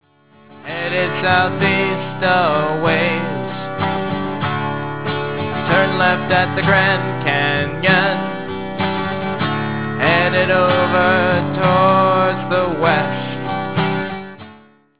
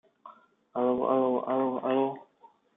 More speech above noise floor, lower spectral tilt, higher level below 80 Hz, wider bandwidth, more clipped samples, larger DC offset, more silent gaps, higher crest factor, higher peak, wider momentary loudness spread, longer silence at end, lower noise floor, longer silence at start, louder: about the same, 32 dB vs 34 dB; about the same, -9.5 dB/octave vs -10 dB/octave; first, -46 dBFS vs -74 dBFS; about the same, 4 kHz vs 3.8 kHz; neither; first, 1% vs under 0.1%; neither; about the same, 16 dB vs 18 dB; first, 0 dBFS vs -12 dBFS; about the same, 9 LU vs 9 LU; second, 0 s vs 0.55 s; second, -48 dBFS vs -60 dBFS; second, 0 s vs 0.25 s; first, -17 LUFS vs -28 LUFS